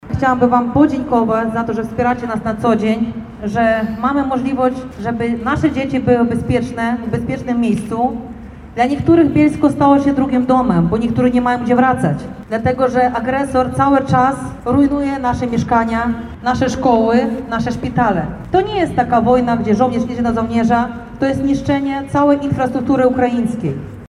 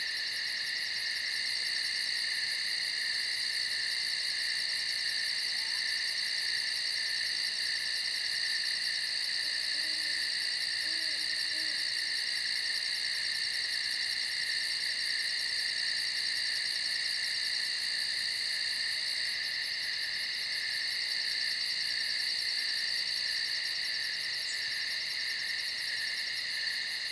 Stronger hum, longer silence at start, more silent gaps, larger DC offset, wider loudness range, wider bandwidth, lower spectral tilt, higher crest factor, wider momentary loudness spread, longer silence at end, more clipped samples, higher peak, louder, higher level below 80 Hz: neither; about the same, 0.05 s vs 0 s; neither; neither; about the same, 3 LU vs 1 LU; about the same, 11.5 kHz vs 11 kHz; first, -7.5 dB/octave vs 2.5 dB/octave; about the same, 14 dB vs 14 dB; first, 7 LU vs 2 LU; about the same, 0 s vs 0 s; neither; first, 0 dBFS vs -20 dBFS; first, -16 LUFS vs -30 LUFS; first, -38 dBFS vs -74 dBFS